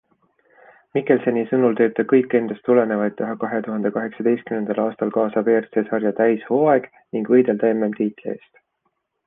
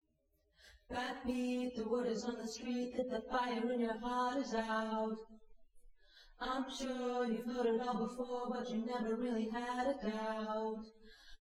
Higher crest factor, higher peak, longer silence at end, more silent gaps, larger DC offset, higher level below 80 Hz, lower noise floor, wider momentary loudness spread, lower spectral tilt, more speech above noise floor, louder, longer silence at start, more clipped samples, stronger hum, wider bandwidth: about the same, 16 dB vs 16 dB; first, -4 dBFS vs -24 dBFS; first, 0.9 s vs 0.05 s; neither; neither; about the same, -68 dBFS vs -64 dBFS; second, -72 dBFS vs -78 dBFS; about the same, 8 LU vs 6 LU; first, -10.5 dB/octave vs -5 dB/octave; first, 53 dB vs 40 dB; first, -20 LUFS vs -39 LUFS; first, 0.95 s vs 0.6 s; neither; neither; second, 3.8 kHz vs 13 kHz